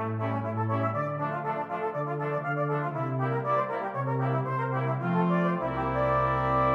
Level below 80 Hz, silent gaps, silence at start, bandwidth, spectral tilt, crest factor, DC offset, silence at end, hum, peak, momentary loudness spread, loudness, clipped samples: -50 dBFS; none; 0 s; 5.6 kHz; -9.5 dB/octave; 14 dB; under 0.1%; 0 s; none; -14 dBFS; 5 LU; -29 LUFS; under 0.1%